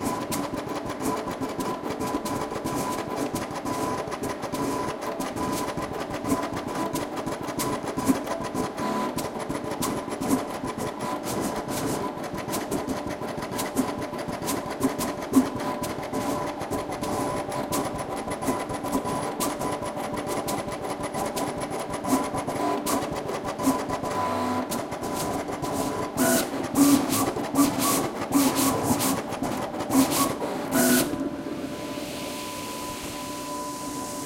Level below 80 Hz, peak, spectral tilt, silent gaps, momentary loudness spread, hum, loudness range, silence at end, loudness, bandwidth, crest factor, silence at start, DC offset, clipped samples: -52 dBFS; -8 dBFS; -4 dB/octave; none; 9 LU; none; 6 LU; 0 s; -28 LUFS; 17 kHz; 20 dB; 0 s; under 0.1%; under 0.1%